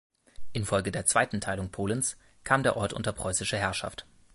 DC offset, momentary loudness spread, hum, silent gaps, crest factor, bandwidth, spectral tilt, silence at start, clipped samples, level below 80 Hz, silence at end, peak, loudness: under 0.1%; 11 LU; none; none; 22 dB; 12 kHz; -3.5 dB/octave; 0.4 s; under 0.1%; -50 dBFS; 0.1 s; -8 dBFS; -29 LUFS